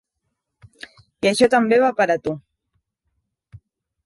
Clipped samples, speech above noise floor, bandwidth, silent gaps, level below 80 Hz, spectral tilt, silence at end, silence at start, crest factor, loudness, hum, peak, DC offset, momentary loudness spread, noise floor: under 0.1%; 60 dB; 11.5 kHz; none; -58 dBFS; -4.5 dB/octave; 1.65 s; 1.25 s; 18 dB; -18 LUFS; none; -4 dBFS; under 0.1%; 11 LU; -77 dBFS